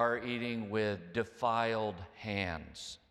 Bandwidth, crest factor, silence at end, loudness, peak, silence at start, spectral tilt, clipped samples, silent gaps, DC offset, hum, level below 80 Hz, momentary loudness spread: 13 kHz; 20 dB; 0.15 s; -36 LUFS; -16 dBFS; 0 s; -5.5 dB/octave; under 0.1%; none; under 0.1%; none; -64 dBFS; 11 LU